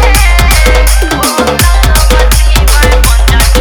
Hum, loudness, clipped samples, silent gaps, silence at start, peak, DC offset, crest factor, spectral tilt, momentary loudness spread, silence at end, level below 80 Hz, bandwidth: none; -7 LUFS; 0.6%; none; 0 s; 0 dBFS; under 0.1%; 6 dB; -3.5 dB/octave; 2 LU; 0 s; -6 dBFS; over 20 kHz